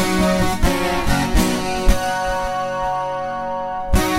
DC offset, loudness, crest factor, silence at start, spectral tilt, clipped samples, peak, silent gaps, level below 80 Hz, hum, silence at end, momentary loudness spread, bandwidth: under 0.1%; -20 LUFS; 16 dB; 0 s; -4.5 dB/octave; under 0.1%; -2 dBFS; none; -24 dBFS; none; 0 s; 7 LU; 16.5 kHz